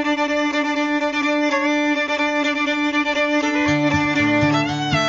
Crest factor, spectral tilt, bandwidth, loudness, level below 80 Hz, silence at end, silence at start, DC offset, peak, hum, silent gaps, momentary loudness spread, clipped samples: 14 dB; -5 dB/octave; 7.8 kHz; -19 LUFS; -50 dBFS; 0 s; 0 s; under 0.1%; -4 dBFS; none; none; 3 LU; under 0.1%